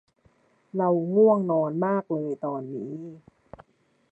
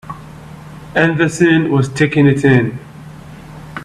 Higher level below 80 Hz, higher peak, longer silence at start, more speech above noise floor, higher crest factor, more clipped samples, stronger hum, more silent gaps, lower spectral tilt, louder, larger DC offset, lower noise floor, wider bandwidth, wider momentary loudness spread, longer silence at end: second, -70 dBFS vs -44 dBFS; second, -8 dBFS vs 0 dBFS; first, 0.75 s vs 0.05 s; first, 39 dB vs 21 dB; about the same, 18 dB vs 14 dB; neither; neither; neither; first, -11.5 dB/octave vs -6.5 dB/octave; second, -25 LUFS vs -13 LUFS; neither; first, -63 dBFS vs -34 dBFS; second, 2.7 kHz vs 12 kHz; second, 16 LU vs 23 LU; first, 0.95 s vs 0 s